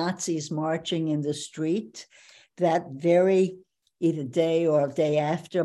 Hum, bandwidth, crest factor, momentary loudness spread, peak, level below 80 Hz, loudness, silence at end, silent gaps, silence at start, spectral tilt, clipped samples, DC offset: none; 12 kHz; 16 dB; 8 LU; -10 dBFS; -72 dBFS; -26 LUFS; 0 s; none; 0 s; -6 dB/octave; under 0.1%; under 0.1%